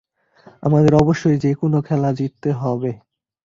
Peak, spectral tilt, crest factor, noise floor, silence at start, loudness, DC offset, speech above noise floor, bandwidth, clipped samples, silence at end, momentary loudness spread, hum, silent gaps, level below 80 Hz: -2 dBFS; -8.5 dB/octave; 16 dB; -50 dBFS; 0.6 s; -18 LUFS; under 0.1%; 33 dB; 7.4 kHz; under 0.1%; 0.5 s; 11 LU; none; none; -46 dBFS